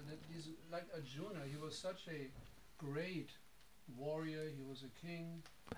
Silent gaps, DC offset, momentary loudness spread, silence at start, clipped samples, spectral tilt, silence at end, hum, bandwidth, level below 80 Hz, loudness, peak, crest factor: none; under 0.1%; 13 LU; 0 s; under 0.1%; -5.5 dB/octave; 0 s; none; over 20 kHz; -72 dBFS; -49 LUFS; -30 dBFS; 20 dB